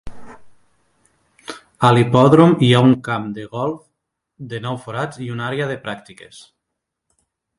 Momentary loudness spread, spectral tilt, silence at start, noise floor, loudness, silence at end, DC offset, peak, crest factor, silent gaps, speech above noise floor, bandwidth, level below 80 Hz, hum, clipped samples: 23 LU; -7 dB/octave; 0.05 s; -79 dBFS; -16 LUFS; 1.2 s; under 0.1%; 0 dBFS; 18 dB; none; 63 dB; 11.5 kHz; -52 dBFS; none; under 0.1%